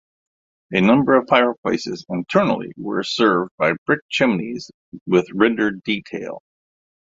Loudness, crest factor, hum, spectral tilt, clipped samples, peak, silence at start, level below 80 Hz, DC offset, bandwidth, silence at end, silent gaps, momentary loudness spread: -19 LUFS; 18 dB; none; -6 dB/octave; under 0.1%; -2 dBFS; 0.7 s; -58 dBFS; under 0.1%; 7.8 kHz; 0.75 s; 1.58-1.63 s, 3.51-3.58 s, 3.78-3.86 s, 4.02-4.09 s, 4.74-4.92 s, 5.01-5.06 s; 15 LU